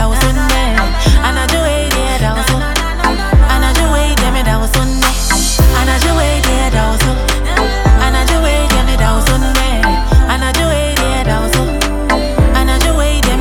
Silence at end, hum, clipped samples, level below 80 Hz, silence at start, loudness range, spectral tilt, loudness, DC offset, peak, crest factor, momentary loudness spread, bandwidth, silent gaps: 0 s; none; under 0.1%; -14 dBFS; 0 s; 1 LU; -4 dB/octave; -12 LUFS; under 0.1%; 0 dBFS; 10 dB; 3 LU; 18.5 kHz; none